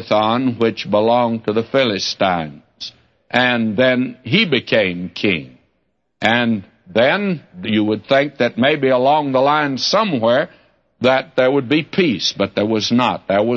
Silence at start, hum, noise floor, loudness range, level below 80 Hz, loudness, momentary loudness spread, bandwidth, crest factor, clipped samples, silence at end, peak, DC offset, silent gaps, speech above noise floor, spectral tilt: 0 s; none; -68 dBFS; 2 LU; -60 dBFS; -17 LUFS; 6 LU; 7.6 kHz; 16 dB; under 0.1%; 0 s; -2 dBFS; under 0.1%; none; 52 dB; -5 dB/octave